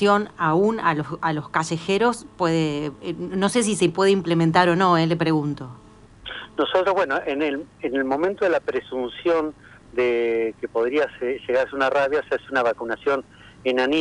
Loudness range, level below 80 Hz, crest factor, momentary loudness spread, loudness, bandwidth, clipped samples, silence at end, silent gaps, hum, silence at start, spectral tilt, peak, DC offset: 4 LU; -56 dBFS; 20 dB; 10 LU; -22 LUFS; 11.5 kHz; under 0.1%; 0 s; none; none; 0 s; -5.5 dB/octave; -2 dBFS; under 0.1%